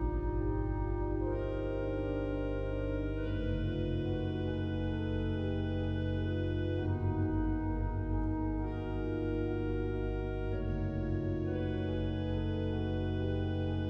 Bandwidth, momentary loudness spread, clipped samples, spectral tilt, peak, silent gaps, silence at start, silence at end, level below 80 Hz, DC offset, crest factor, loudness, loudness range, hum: 5.8 kHz; 2 LU; under 0.1%; -10 dB/octave; -22 dBFS; none; 0 s; 0 s; -40 dBFS; under 0.1%; 12 dB; -35 LUFS; 1 LU; none